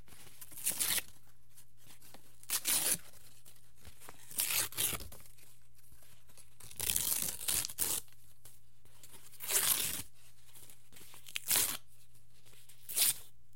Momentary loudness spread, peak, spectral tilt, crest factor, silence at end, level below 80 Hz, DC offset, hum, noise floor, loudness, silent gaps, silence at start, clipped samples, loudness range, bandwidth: 24 LU; -10 dBFS; 0.5 dB/octave; 30 dB; 0.3 s; -64 dBFS; 0.6%; none; -66 dBFS; -33 LUFS; none; 0.1 s; under 0.1%; 3 LU; 17 kHz